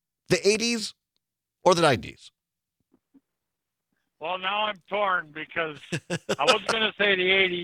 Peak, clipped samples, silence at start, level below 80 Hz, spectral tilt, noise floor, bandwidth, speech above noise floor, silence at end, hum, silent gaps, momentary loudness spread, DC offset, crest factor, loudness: -4 dBFS; under 0.1%; 0.3 s; -64 dBFS; -3.5 dB/octave; -85 dBFS; 15.5 kHz; 60 dB; 0 s; none; none; 12 LU; under 0.1%; 24 dB; -24 LUFS